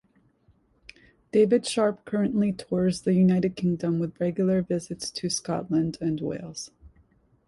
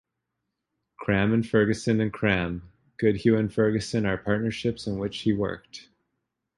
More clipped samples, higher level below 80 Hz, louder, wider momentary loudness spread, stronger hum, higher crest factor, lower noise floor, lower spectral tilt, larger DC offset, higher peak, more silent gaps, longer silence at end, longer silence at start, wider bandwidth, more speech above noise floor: neither; second, -58 dBFS vs -50 dBFS; about the same, -26 LUFS vs -25 LUFS; about the same, 10 LU vs 10 LU; neither; about the same, 16 dB vs 20 dB; second, -64 dBFS vs -82 dBFS; about the same, -6 dB/octave vs -6.5 dB/octave; neither; second, -10 dBFS vs -6 dBFS; neither; second, 0.6 s vs 0.75 s; first, 1.35 s vs 1 s; about the same, 11.5 kHz vs 11 kHz; second, 39 dB vs 57 dB